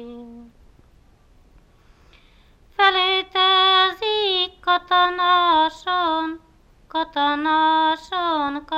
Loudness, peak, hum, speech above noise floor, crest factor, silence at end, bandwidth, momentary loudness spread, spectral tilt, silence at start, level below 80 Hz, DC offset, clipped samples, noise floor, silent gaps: -19 LUFS; -2 dBFS; none; 34 dB; 18 dB; 0 s; 8.8 kHz; 12 LU; -3 dB/octave; 0 s; -54 dBFS; under 0.1%; under 0.1%; -53 dBFS; none